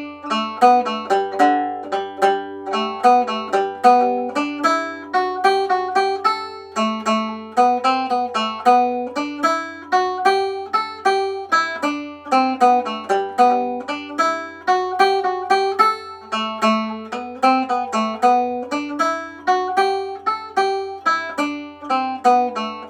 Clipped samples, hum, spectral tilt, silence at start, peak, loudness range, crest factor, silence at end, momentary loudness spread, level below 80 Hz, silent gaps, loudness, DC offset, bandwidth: under 0.1%; none; -3.5 dB/octave; 0 s; 0 dBFS; 2 LU; 20 dB; 0 s; 9 LU; -70 dBFS; none; -19 LUFS; under 0.1%; 13 kHz